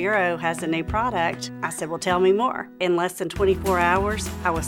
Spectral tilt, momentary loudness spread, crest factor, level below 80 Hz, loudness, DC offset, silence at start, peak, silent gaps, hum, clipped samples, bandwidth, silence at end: -5 dB/octave; 7 LU; 18 dB; -42 dBFS; -23 LUFS; under 0.1%; 0 s; -6 dBFS; none; none; under 0.1%; 18 kHz; 0 s